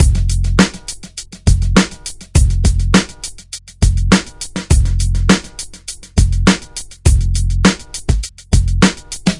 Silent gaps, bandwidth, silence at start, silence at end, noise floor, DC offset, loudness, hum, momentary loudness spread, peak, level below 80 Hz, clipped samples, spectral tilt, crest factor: none; 11.5 kHz; 0 s; 0 s; -33 dBFS; under 0.1%; -15 LUFS; none; 15 LU; 0 dBFS; -18 dBFS; 0.1%; -5 dB/octave; 14 dB